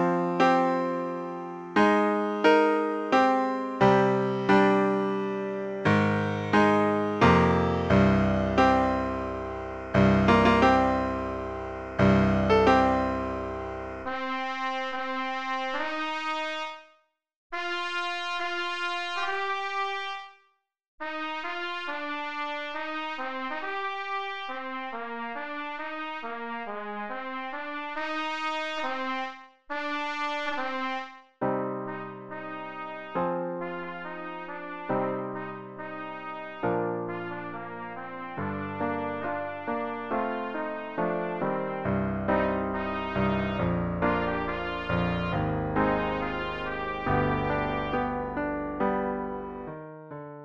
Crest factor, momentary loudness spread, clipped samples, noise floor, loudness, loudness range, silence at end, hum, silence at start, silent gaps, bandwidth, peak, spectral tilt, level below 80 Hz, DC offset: 20 dB; 15 LU; under 0.1%; -69 dBFS; -28 LUFS; 10 LU; 0 s; none; 0 s; 17.36-17.50 s, 20.88-20.98 s; 8.8 kHz; -8 dBFS; -7 dB/octave; -48 dBFS; under 0.1%